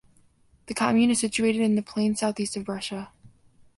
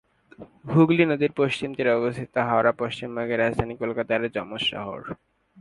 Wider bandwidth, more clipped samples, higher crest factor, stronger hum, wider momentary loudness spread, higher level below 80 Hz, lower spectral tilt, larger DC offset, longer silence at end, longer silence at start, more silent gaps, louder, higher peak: about the same, 11.5 kHz vs 11 kHz; neither; about the same, 18 dB vs 20 dB; neither; about the same, 13 LU vs 14 LU; second, -60 dBFS vs -54 dBFS; second, -4 dB/octave vs -7 dB/octave; neither; about the same, 0.5 s vs 0.45 s; first, 0.7 s vs 0.4 s; neither; about the same, -25 LUFS vs -24 LUFS; second, -8 dBFS vs -4 dBFS